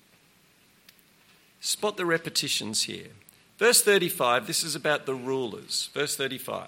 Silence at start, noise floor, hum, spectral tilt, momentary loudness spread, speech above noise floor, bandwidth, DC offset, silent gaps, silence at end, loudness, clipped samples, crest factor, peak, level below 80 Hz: 1.6 s; -61 dBFS; none; -2 dB/octave; 11 LU; 34 dB; 16.5 kHz; under 0.1%; none; 0 s; -26 LUFS; under 0.1%; 22 dB; -6 dBFS; -76 dBFS